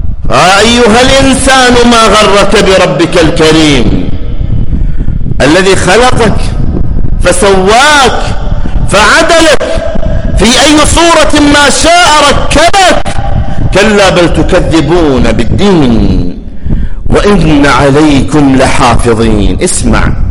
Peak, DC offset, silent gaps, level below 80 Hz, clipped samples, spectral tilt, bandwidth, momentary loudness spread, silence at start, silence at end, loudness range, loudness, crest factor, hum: 0 dBFS; under 0.1%; none; -12 dBFS; 2%; -4 dB/octave; 12.5 kHz; 10 LU; 0 s; 0 s; 4 LU; -5 LUFS; 4 dB; none